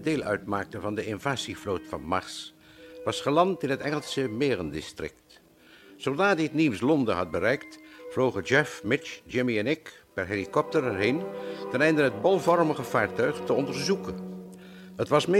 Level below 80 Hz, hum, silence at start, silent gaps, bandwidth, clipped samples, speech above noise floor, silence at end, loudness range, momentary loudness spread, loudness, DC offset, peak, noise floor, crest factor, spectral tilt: -60 dBFS; none; 0 s; none; 16 kHz; under 0.1%; 28 dB; 0 s; 4 LU; 15 LU; -27 LUFS; under 0.1%; -8 dBFS; -54 dBFS; 20 dB; -5.5 dB/octave